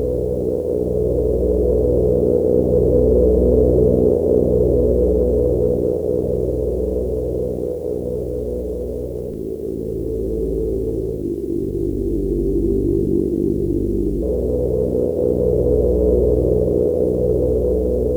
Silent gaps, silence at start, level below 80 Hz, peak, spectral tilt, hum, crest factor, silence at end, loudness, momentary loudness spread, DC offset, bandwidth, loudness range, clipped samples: none; 0 s; -26 dBFS; -2 dBFS; -11 dB/octave; none; 14 dB; 0 s; -19 LUFS; 9 LU; under 0.1%; 19 kHz; 8 LU; under 0.1%